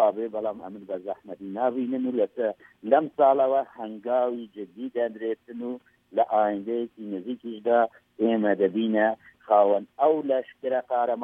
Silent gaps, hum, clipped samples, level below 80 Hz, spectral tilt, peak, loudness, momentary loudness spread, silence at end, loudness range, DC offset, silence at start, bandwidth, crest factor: none; none; under 0.1%; -76 dBFS; -8.5 dB/octave; -6 dBFS; -26 LUFS; 15 LU; 0 s; 4 LU; under 0.1%; 0 s; 3.8 kHz; 20 dB